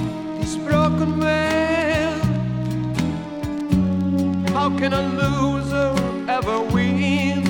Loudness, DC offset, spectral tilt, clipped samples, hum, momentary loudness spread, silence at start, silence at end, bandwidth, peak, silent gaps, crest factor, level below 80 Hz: -21 LUFS; under 0.1%; -6.5 dB/octave; under 0.1%; none; 7 LU; 0 s; 0 s; 17.5 kHz; -6 dBFS; none; 14 dB; -38 dBFS